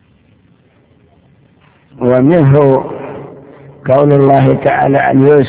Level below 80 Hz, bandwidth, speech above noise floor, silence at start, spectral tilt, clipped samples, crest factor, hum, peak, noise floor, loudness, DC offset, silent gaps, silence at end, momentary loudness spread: -44 dBFS; 4 kHz; 41 dB; 2 s; -12.5 dB/octave; 1%; 12 dB; none; 0 dBFS; -49 dBFS; -9 LUFS; under 0.1%; none; 0 s; 17 LU